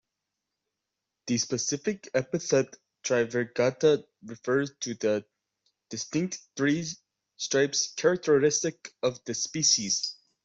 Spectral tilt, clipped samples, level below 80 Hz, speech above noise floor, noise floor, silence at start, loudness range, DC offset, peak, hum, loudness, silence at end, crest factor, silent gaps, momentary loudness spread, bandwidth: -3 dB/octave; under 0.1%; -70 dBFS; 58 dB; -86 dBFS; 1.25 s; 5 LU; under 0.1%; -10 dBFS; none; -28 LUFS; 0.3 s; 20 dB; none; 13 LU; 8.2 kHz